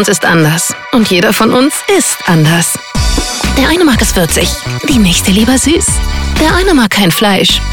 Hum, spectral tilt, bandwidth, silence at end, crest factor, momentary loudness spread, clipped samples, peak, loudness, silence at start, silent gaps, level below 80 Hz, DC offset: none; -3.5 dB/octave; 19.5 kHz; 0 s; 10 dB; 5 LU; under 0.1%; 0 dBFS; -9 LUFS; 0 s; none; -20 dBFS; under 0.1%